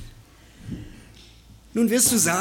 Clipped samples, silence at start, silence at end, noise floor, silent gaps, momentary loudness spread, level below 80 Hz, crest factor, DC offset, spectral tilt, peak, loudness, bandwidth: under 0.1%; 0 s; 0 s; -49 dBFS; none; 21 LU; -48 dBFS; 20 dB; under 0.1%; -3 dB/octave; -6 dBFS; -20 LUFS; 17.5 kHz